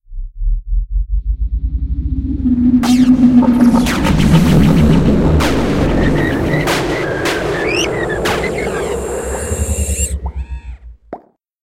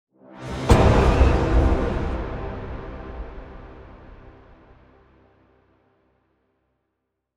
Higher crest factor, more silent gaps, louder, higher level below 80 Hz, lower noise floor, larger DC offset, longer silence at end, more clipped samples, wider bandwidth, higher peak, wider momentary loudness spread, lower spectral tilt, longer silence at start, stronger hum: second, 14 dB vs 22 dB; neither; first, -14 LUFS vs -21 LUFS; first, -20 dBFS vs -26 dBFS; second, -34 dBFS vs -78 dBFS; neither; second, 0.35 s vs 3.2 s; neither; first, 16 kHz vs 10 kHz; about the same, 0 dBFS vs -2 dBFS; second, 14 LU vs 25 LU; about the same, -6 dB/octave vs -7 dB/octave; second, 0.1 s vs 0.35 s; neither